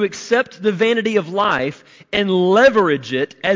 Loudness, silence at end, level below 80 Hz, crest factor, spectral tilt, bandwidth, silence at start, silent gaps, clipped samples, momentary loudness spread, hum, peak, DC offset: -17 LUFS; 0 s; -56 dBFS; 12 dB; -5 dB/octave; 7.6 kHz; 0 s; none; under 0.1%; 9 LU; none; -4 dBFS; under 0.1%